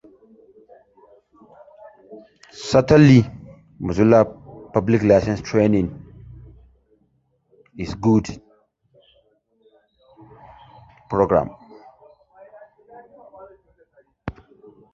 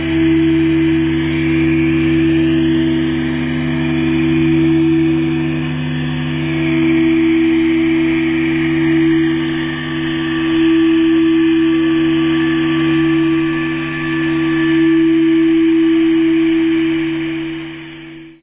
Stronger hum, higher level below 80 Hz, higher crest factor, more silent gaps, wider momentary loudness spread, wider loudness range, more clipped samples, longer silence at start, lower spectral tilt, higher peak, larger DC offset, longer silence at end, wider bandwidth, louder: neither; second, -46 dBFS vs -36 dBFS; first, 20 dB vs 10 dB; neither; first, 23 LU vs 7 LU; first, 10 LU vs 2 LU; neither; first, 2.1 s vs 0 s; second, -7.5 dB/octave vs -11 dB/octave; about the same, -2 dBFS vs -4 dBFS; second, under 0.1% vs 0.2%; first, 0.65 s vs 0.1 s; first, 7.8 kHz vs 3.9 kHz; second, -18 LUFS vs -14 LUFS